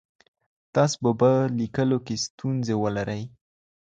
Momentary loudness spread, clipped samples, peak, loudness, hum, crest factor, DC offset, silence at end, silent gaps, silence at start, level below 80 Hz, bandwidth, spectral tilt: 10 LU; under 0.1%; -8 dBFS; -25 LUFS; none; 18 dB; under 0.1%; 0.65 s; 2.30-2.38 s; 0.75 s; -58 dBFS; 9.2 kHz; -6 dB/octave